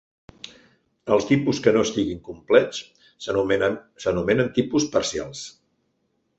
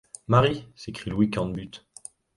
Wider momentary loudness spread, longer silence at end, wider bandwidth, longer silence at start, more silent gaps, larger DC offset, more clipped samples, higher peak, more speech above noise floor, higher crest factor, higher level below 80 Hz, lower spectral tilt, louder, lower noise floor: second, 18 LU vs 21 LU; first, 0.9 s vs 0.6 s; second, 8.2 kHz vs 11.5 kHz; first, 1.05 s vs 0.3 s; neither; neither; neither; first, -2 dBFS vs -6 dBFS; first, 49 dB vs 23 dB; about the same, 22 dB vs 20 dB; about the same, -52 dBFS vs -50 dBFS; second, -5 dB/octave vs -6.5 dB/octave; first, -22 LUFS vs -25 LUFS; first, -71 dBFS vs -48 dBFS